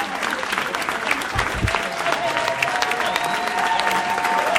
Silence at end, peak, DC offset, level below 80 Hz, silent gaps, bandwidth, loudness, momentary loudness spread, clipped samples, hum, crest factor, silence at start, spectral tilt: 0 s; -2 dBFS; under 0.1%; -40 dBFS; none; 16.5 kHz; -21 LUFS; 3 LU; under 0.1%; none; 20 dB; 0 s; -3 dB/octave